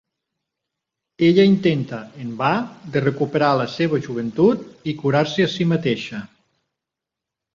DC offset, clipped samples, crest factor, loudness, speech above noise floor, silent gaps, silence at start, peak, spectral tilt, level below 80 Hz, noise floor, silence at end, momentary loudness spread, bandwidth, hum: under 0.1%; under 0.1%; 18 dB; -20 LUFS; 66 dB; none; 1.2 s; -2 dBFS; -7 dB/octave; -60 dBFS; -85 dBFS; 1.3 s; 13 LU; 7.4 kHz; none